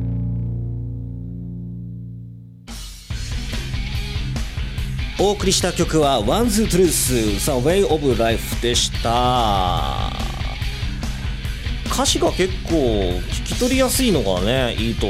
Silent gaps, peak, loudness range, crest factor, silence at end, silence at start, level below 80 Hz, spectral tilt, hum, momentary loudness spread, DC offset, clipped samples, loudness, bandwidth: none; -6 dBFS; 12 LU; 14 dB; 0 s; 0 s; -28 dBFS; -4.5 dB/octave; none; 14 LU; under 0.1%; under 0.1%; -20 LUFS; 16.5 kHz